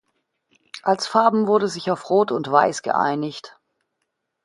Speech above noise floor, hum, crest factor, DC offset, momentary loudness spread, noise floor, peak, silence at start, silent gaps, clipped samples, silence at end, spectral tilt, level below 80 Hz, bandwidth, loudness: 57 dB; none; 20 dB; under 0.1%; 10 LU; -77 dBFS; -2 dBFS; 0.75 s; none; under 0.1%; 0.95 s; -5 dB/octave; -70 dBFS; 11.5 kHz; -20 LUFS